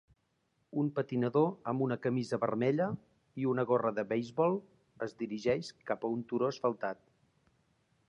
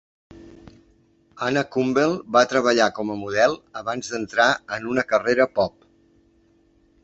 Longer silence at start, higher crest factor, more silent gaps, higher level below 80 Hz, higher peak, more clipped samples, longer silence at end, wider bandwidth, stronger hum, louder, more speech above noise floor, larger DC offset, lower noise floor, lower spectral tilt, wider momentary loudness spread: first, 0.75 s vs 0.35 s; about the same, 18 dB vs 20 dB; neither; second, -74 dBFS vs -58 dBFS; second, -16 dBFS vs -2 dBFS; neither; second, 1.15 s vs 1.35 s; first, 10.5 kHz vs 8.2 kHz; neither; second, -34 LUFS vs -21 LUFS; first, 44 dB vs 38 dB; neither; first, -77 dBFS vs -60 dBFS; first, -7.5 dB/octave vs -4 dB/octave; about the same, 10 LU vs 10 LU